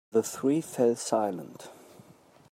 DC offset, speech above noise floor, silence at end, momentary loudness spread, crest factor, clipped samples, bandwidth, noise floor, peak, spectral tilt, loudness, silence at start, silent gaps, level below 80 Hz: under 0.1%; 29 dB; 0.8 s; 20 LU; 18 dB; under 0.1%; 16 kHz; -57 dBFS; -12 dBFS; -5 dB/octave; -28 LUFS; 0.15 s; none; -78 dBFS